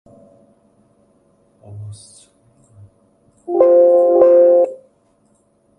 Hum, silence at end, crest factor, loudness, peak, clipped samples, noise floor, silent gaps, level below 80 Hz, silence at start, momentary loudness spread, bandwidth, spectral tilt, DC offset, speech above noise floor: none; 1.05 s; 16 dB; -12 LUFS; 0 dBFS; under 0.1%; -58 dBFS; none; -60 dBFS; 1.7 s; 25 LU; 10 kHz; -8 dB/octave; under 0.1%; 43 dB